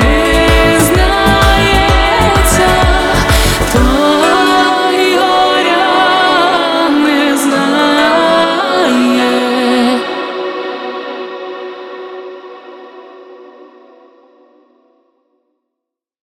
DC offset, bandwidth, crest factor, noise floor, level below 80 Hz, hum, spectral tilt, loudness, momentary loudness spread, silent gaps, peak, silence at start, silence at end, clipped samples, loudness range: under 0.1%; 17 kHz; 10 dB; -80 dBFS; -22 dBFS; none; -4.5 dB/octave; -10 LUFS; 14 LU; none; 0 dBFS; 0 s; 2.75 s; under 0.1%; 16 LU